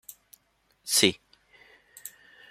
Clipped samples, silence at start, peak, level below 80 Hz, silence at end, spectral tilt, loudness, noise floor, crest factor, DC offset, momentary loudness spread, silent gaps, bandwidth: under 0.1%; 0.85 s; -2 dBFS; -72 dBFS; 0.45 s; -1.5 dB/octave; -23 LUFS; -69 dBFS; 30 dB; under 0.1%; 24 LU; none; 16 kHz